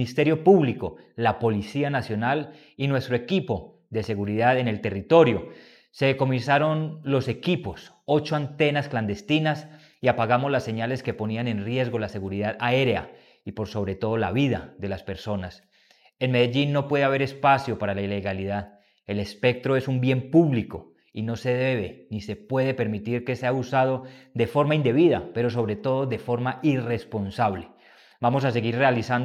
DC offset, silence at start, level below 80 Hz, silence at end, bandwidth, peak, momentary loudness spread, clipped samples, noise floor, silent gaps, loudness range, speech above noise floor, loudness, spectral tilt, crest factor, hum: under 0.1%; 0 s; -58 dBFS; 0 s; 12.5 kHz; -2 dBFS; 12 LU; under 0.1%; -60 dBFS; none; 3 LU; 36 dB; -24 LUFS; -7.5 dB/octave; 22 dB; none